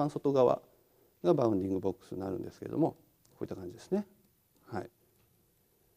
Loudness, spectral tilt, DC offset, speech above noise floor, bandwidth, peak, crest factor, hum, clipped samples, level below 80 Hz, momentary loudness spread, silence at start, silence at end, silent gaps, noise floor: -33 LUFS; -8.5 dB/octave; under 0.1%; 38 dB; 15.5 kHz; -12 dBFS; 22 dB; none; under 0.1%; -70 dBFS; 15 LU; 0 s; 1.1 s; none; -70 dBFS